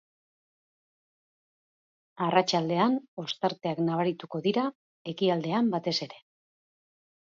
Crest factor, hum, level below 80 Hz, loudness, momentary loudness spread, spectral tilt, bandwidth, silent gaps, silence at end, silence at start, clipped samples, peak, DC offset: 22 dB; none; -78 dBFS; -28 LUFS; 9 LU; -5.5 dB/octave; 7.8 kHz; 3.08-3.17 s, 4.75-5.05 s; 1.15 s; 2.15 s; under 0.1%; -8 dBFS; under 0.1%